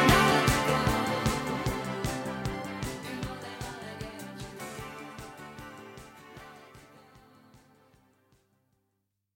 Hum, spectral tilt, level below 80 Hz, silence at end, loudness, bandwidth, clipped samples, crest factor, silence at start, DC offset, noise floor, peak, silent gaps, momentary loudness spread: none; -4.5 dB/octave; -46 dBFS; 1.8 s; -30 LUFS; 17 kHz; under 0.1%; 24 dB; 0 s; under 0.1%; -80 dBFS; -8 dBFS; none; 23 LU